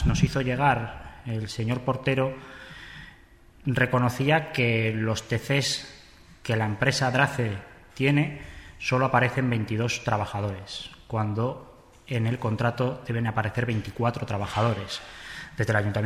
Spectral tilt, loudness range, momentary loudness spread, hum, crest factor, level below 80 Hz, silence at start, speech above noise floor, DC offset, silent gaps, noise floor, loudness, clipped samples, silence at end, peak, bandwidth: -5.5 dB/octave; 4 LU; 16 LU; none; 20 dB; -44 dBFS; 0 s; 27 dB; under 0.1%; none; -53 dBFS; -26 LUFS; under 0.1%; 0 s; -8 dBFS; 14.5 kHz